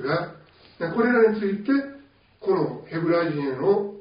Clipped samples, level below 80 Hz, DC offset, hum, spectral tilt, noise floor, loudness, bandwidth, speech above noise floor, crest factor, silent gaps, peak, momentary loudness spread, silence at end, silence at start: under 0.1%; -64 dBFS; under 0.1%; none; -5.5 dB/octave; -50 dBFS; -24 LUFS; 5.2 kHz; 28 dB; 16 dB; none; -8 dBFS; 12 LU; 0 s; 0 s